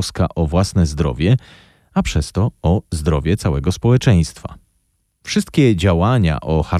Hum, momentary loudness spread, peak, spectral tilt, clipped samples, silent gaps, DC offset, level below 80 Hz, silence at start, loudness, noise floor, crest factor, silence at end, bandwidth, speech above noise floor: none; 7 LU; -4 dBFS; -6.5 dB/octave; under 0.1%; none; under 0.1%; -28 dBFS; 0 s; -17 LUFS; -65 dBFS; 14 dB; 0 s; 13.5 kHz; 49 dB